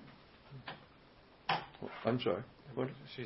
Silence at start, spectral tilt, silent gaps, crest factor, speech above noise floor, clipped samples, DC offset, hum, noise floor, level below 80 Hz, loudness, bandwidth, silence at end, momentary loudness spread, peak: 0 s; -4 dB/octave; none; 22 dB; 24 dB; under 0.1%; under 0.1%; none; -62 dBFS; -70 dBFS; -40 LUFS; 5.8 kHz; 0 s; 21 LU; -18 dBFS